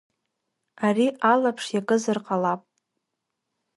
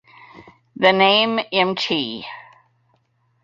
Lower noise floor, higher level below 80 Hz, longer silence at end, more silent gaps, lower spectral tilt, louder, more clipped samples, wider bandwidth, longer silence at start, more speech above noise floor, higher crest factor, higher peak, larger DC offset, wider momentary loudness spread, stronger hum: first, -81 dBFS vs -64 dBFS; second, -76 dBFS vs -64 dBFS; first, 1.2 s vs 1 s; neither; about the same, -5 dB/octave vs -5 dB/octave; second, -24 LUFS vs -17 LUFS; neither; first, 11.5 kHz vs 7.6 kHz; first, 0.8 s vs 0.35 s; first, 59 dB vs 46 dB; about the same, 20 dB vs 20 dB; second, -6 dBFS vs -2 dBFS; neither; second, 7 LU vs 19 LU; neither